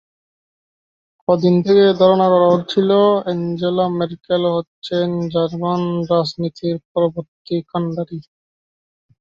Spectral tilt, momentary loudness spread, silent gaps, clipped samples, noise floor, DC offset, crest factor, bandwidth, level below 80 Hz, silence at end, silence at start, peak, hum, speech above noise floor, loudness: -8 dB/octave; 11 LU; 4.67-4.82 s, 6.85-6.95 s, 7.28-7.45 s; under 0.1%; under -90 dBFS; under 0.1%; 16 dB; 7.4 kHz; -58 dBFS; 1 s; 1.3 s; -2 dBFS; none; over 74 dB; -17 LUFS